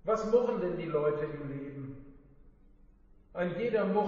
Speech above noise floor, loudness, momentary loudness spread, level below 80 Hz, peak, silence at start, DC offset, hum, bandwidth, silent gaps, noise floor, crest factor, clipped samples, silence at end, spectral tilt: 28 dB; -32 LUFS; 17 LU; -56 dBFS; -14 dBFS; 0.05 s; under 0.1%; none; 7.2 kHz; none; -59 dBFS; 20 dB; under 0.1%; 0 s; -6.5 dB/octave